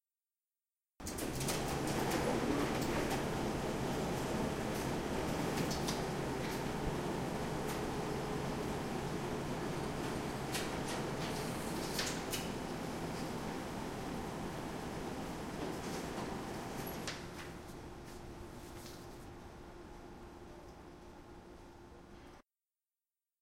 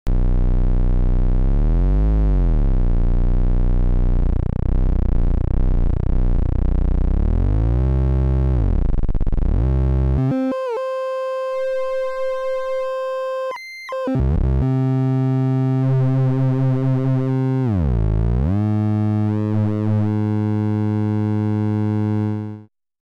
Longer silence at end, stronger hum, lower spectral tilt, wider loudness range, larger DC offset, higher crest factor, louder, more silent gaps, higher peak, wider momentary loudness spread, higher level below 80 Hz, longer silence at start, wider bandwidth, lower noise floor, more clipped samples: first, 1 s vs 0.55 s; neither; second, -4.5 dB/octave vs -10 dB/octave; first, 15 LU vs 3 LU; neither; first, 20 dB vs 8 dB; second, -39 LUFS vs -20 LUFS; neither; second, -20 dBFS vs -8 dBFS; first, 17 LU vs 5 LU; second, -54 dBFS vs -20 dBFS; first, 1 s vs 0.05 s; first, 16 kHz vs 5 kHz; first, under -90 dBFS vs -38 dBFS; neither